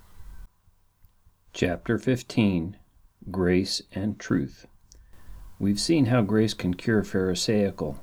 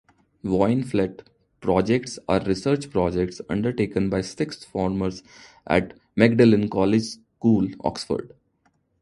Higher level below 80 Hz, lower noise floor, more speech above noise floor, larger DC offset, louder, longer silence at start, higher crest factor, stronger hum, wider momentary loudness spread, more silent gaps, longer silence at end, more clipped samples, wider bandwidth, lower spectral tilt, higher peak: about the same, -50 dBFS vs -48 dBFS; second, -62 dBFS vs -67 dBFS; second, 37 dB vs 45 dB; neither; second, -26 LUFS vs -23 LUFS; second, 0.15 s vs 0.45 s; about the same, 20 dB vs 24 dB; neither; about the same, 9 LU vs 10 LU; neither; second, 0 s vs 0.75 s; neither; first, 16.5 kHz vs 11.5 kHz; about the same, -5.5 dB/octave vs -6.5 dB/octave; second, -8 dBFS vs 0 dBFS